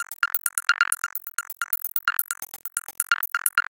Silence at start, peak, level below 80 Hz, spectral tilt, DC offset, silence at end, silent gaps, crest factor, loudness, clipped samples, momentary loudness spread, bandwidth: 0 s; -2 dBFS; -78 dBFS; 4.5 dB/octave; under 0.1%; 0.1 s; none; 24 dB; -25 LUFS; under 0.1%; 9 LU; 17.5 kHz